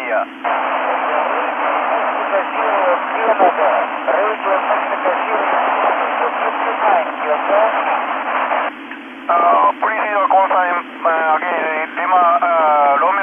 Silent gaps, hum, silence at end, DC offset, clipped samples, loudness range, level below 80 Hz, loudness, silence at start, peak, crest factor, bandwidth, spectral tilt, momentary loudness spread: none; none; 0 s; under 0.1%; under 0.1%; 2 LU; -70 dBFS; -16 LUFS; 0 s; -2 dBFS; 14 dB; 3.7 kHz; -5 dB/octave; 6 LU